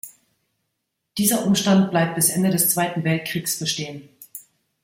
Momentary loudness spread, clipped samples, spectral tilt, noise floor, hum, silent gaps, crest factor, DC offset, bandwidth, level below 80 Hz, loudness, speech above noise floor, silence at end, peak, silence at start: 21 LU; under 0.1%; -4 dB/octave; -77 dBFS; none; none; 20 dB; under 0.1%; 16.5 kHz; -62 dBFS; -20 LUFS; 57 dB; 0.45 s; -2 dBFS; 0.05 s